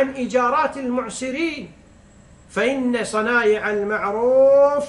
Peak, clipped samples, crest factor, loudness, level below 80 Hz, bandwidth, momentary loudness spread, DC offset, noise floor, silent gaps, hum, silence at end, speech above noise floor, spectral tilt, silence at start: -6 dBFS; under 0.1%; 14 dB; -19 LUFS; -54 dBFS; 11.5 kHz; 11 LU; under 0.1%; -48 dBFS; none; none; 0 s; 29 dB; -4.5 dB/octave; 0 s